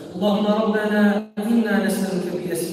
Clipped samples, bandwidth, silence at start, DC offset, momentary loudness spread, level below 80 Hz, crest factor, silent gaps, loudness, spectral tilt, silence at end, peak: under 0.1%; 16 kHz; 0 s; under 0.1%; 7 LU; -62 dBFS; 14 dB; none; -21 LUFS; -6 dB/octave; 0 s; -6 dBFS